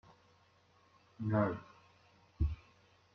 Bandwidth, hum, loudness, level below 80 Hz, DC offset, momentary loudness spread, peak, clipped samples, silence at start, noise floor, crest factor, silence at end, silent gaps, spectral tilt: 6.4 kHz; none; -38 LUFS; -48 dBFS; under 0.1%; 16 LU; -20 dBFS; under 0.1%; 1.2 s; -69 dBFS; 20 dB; 0.6 s; none; -9.5 dB/octave